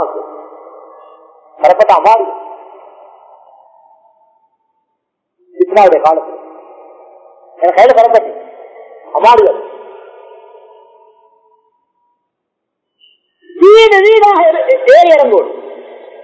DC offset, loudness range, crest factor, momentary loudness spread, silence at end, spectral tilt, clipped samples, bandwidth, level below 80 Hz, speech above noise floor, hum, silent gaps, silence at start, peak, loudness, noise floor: under 0.1%; 8 LU; 12 dB; 25 LU; 0.4 s; -3.5 dB/octave; 3%; 8 kHz; -56 dBFS; 67 dB; none; none; 0 s; 0 dBFS; -8 LUFS; -73 dBFS